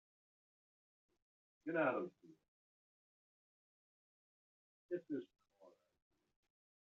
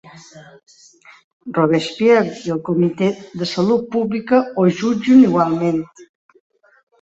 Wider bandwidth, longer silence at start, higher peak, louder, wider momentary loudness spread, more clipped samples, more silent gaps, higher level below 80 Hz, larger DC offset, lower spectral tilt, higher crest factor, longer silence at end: second, 6.8 kHz vs 8 kHz; first, 1.65 s vs 0.05 s; second, -26 dBFS vs -2 dBFS; second, -43 LUFS vs -17 LUFS; about the same, 14 LU vs 12 LU; neither; first, 2.48-4.89 s vs 1.24-1.40 s; second, under -90 dBFS vs -60 dBFS; neither; second, -5.5 dB/octave vs -7 dB/octave; first, 24 dB vs 16 dB; first, 1.3 s vs 0.95 s